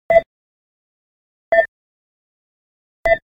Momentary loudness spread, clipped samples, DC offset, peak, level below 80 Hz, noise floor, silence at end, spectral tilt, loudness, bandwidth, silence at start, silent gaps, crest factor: 7 LU; under 0.1%; under 0.1%; 0 dBFS; -44 dBFS; under -90 dBFS; 0.1 s; -5 dB/octave; -18 LUFS; 5.2 kHz; 0.1 s; 0.26-1.52 s, 1.68-3.04 s; 20 dB